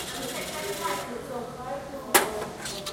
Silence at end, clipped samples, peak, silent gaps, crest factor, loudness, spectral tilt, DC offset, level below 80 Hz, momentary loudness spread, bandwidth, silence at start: 0 s; under 0.1%; -4 dBFS; none; 26 dB; -29 LUFS; -2 dB/octave; under 0.1%; -56 dBFS; 13 LU; 16.5 kHz; 0 s